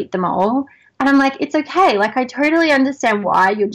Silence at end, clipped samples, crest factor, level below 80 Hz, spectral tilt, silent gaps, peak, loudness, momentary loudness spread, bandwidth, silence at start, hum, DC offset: 0 s; under 0.1%; 12 dB; -58 dBFS; -5 dB/octave; none; -4 dBFS; -16 LUFS; 6 LU; 10.5 kHz; 0 s; none; under 0.1%